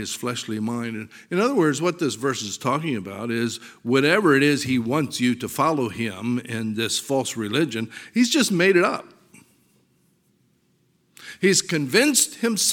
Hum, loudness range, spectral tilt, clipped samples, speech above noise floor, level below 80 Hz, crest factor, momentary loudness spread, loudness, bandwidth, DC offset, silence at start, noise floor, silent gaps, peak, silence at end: none; 3 LU; -3.5 dB/octave; under 0.1%; 43 dB; -66 dBFS; 18 dB; 11 LU; -22 LUFS; 18.5 kHz; under 0.1%; 0 s; -65 dBFS; none; -4 dBFS; 0 s